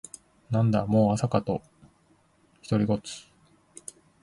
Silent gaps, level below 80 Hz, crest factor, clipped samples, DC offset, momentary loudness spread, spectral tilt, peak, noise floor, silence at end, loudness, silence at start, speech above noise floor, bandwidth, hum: none; -56 dBFS; 20 dB; under 0.1%; under 0.1%; 22 LU; -7 dB/octave; -8 dBFS; -64 dBFS; 1 s; -26 LUFS; 0.5 s; 39 dB; 11.5 kHz; none